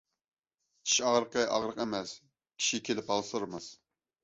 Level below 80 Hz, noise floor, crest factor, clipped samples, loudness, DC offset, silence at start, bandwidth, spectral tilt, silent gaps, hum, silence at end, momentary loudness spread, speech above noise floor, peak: -72 dBFS; -80 dBFS; 20 dB; under 0.1%; -31 LUFS; under 0.1%; 0.85 s; 8.4 kHz; -2 dB/octave; none; none; 0.5 s; 17 LU; 48 dB; -14 dBFS